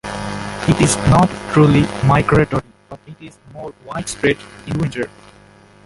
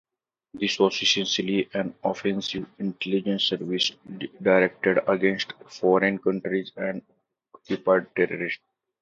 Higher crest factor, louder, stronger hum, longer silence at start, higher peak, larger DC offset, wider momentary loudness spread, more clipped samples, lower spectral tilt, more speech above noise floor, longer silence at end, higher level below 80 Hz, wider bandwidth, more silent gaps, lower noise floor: about the same, 16 dB vs 20 dB; first, -16 LUFS vs -25 LUFS; neither; second, 0.05 s vs 0.55 s; first, -2 dBFS vs -6 dBFS; neither; first, 20 LU vs 10 LU; neither; first, -6 dB/octave vs -4.5 dB/octave; about the same, 30 dB vs 32 dB; first, 0.75 s vs 0.45 s; first, -38 dBFS vs -68 dBFS; first, 11.5 kHz vs 7.8 kHz; neither; second, -46 dBFS vs -56 dBFS